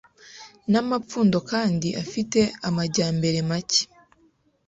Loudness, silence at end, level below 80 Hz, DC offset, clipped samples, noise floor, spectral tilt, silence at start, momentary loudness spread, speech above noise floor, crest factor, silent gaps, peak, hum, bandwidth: -23 LUFS; 0.8 s; -58 dBFS; under 0.1%; under 0.1%; -63 dBFS; -4.5 dB/octave; 0.25 s; 9 LU; 40 dB; 16 dB; none; -8 dBFS; none; 8.2 kHz